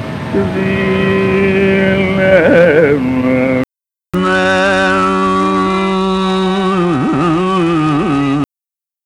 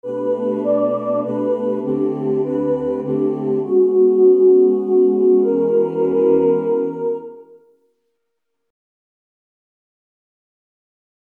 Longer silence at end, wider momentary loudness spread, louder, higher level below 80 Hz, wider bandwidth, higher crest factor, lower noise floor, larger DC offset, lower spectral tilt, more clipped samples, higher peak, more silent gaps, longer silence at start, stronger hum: second, 0.6 s vs 3.8 s; about the same, 7 LU vs 8 LU; first, -12 LUFS vs -17 LUFS; first, -38 dBFS vs -60 dBFS; first, 11 kHz vs 3.1 kHz; about the same, 12 dB vs 14 dB; first, -89 dBFS vs -77 dBFS; neither; second, -6.5 dB/octave vs -11 dB/octave; neither; first, 0 dBFS vs -4 dBFS; neither; about the same, 0 s vs 0.05 s; neither